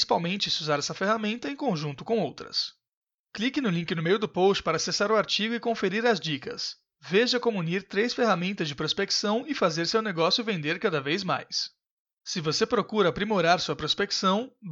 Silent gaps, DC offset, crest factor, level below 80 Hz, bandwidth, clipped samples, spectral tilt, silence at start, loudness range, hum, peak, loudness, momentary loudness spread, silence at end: 2.93-3.02 s, 3.14-3.24 s, 11.91-12.05 s, 12.13-12.17 s; under 0.1%; 18 dB; -62 dBFS; 8 kHz; under 0.1%; -4 dB/octave; 0 s; 3 LU; none; -10 dBFS; -26 LUFS; 7 LU; 0 s